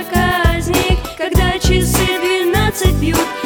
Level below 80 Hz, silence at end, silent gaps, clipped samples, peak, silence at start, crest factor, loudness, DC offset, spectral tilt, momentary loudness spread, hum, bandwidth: -20 dBFS; 0 s; none; under 0.1%; 0 dBFS; 0 s; 14 dB; -15 LUFS; under 0.1%; -4.5 dB/octave; 3 LU; none; over 20 kHz